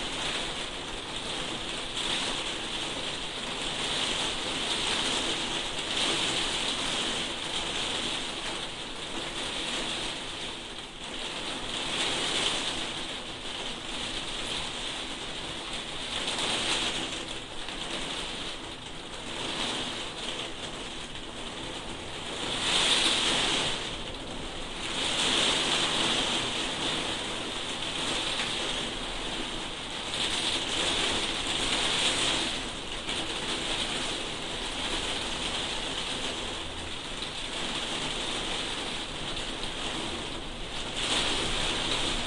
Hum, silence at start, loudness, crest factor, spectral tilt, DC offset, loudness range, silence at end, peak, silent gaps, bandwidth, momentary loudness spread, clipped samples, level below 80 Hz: none; 0 s; -30 LUFS; 20 dB; -1.5 dB/octave; under 0.1%; 6 LU; 0 s; -12 dBFS; none; 11.5 kHz; 10 LU; under 0.1%; -46 dBFS